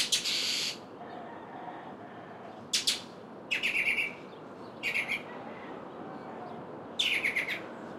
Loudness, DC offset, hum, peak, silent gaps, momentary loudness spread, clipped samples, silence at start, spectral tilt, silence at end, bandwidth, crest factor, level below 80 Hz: -30 LUFS; under 0.1%; none; -14 dBFS; none; 19 LU; under 0.1%; 0 s; -0.5 dB/octave; 0 s; 16.5 kHz; 22 dB; -74 dBFS